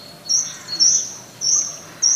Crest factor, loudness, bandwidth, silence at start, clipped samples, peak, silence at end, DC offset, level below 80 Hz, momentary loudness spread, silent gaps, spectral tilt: 18 dB; -17 LUFS; 15.5 kHz; 0 s; under 0.1%; -4 dBFS; 0 s; under 0.1%; -70 dBFS; 12 LU; none; 2 dB/octave